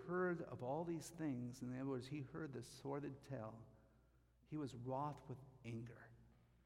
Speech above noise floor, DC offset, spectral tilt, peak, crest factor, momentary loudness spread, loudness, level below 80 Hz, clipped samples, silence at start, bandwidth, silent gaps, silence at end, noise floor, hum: 25 dB; under 0.1%; -7 dB/octave; -32 dBFS; 16 dB; 11 LU; -49 LUFS; -74 dBFS; under 0.1%; 0 s; 16 kHz; none; 0.35 s; -74 dBFS; none